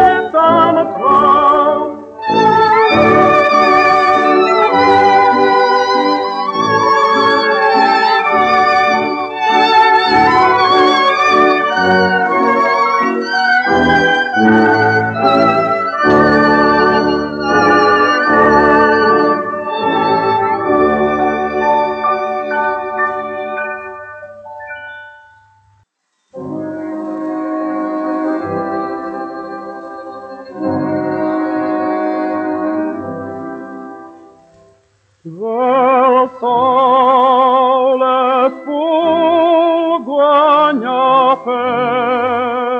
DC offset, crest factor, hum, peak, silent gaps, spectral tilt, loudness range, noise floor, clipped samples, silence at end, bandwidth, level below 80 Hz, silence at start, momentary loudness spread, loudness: under 0.1%; 12 dB; none; 0 dBFS; none; -5.5 dB/octave; 11 LU; -65 dBFS; under 0.1%; 0 s; 8.4 kHz; -48 dBFS; 0 s; 14 LU; -12 LUFS